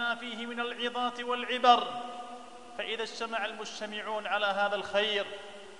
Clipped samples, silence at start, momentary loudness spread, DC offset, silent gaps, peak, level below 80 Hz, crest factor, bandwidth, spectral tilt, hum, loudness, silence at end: under 0.1%; 0 s; 15 LU; 0.2%; none; -10 dBFS; -74 dBFS; 22 dB; 11 kHz; -2.5 dB/octave; none; -31 LUFS; 0 s